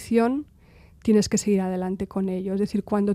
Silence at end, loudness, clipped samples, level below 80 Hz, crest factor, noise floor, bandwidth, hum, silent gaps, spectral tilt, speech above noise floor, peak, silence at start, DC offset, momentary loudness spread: 0 s; -24 LUFS; under 0.1%; -52 dBFS; 16 dB; -52 dBFS; 14.5 kHz; none; none; -6 dB/octave; 29 dB; -8 dBFS; 0 s; under 0.1%; 7 LU